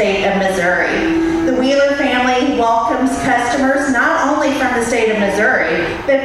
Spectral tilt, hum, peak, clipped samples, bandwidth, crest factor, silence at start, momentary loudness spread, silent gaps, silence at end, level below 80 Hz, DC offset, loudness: -4.5 dB/octave; none; -2 dBFS; under 0.1%; 13 kHz; 12 dB; 0 s; 2 LU; none; 0 s; -40 dBFS; under 0.1%; -14 LUFS